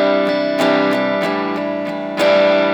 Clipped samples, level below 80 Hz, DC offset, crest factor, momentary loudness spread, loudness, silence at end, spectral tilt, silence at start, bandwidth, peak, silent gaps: under 0.1%; -66 dBFS; under 0.1%; 12 dB; 9 LU; -16 LUFS; 0 s; -5.5 dB/octave; 0 s; 18.5 kHz; -2 dBFS; none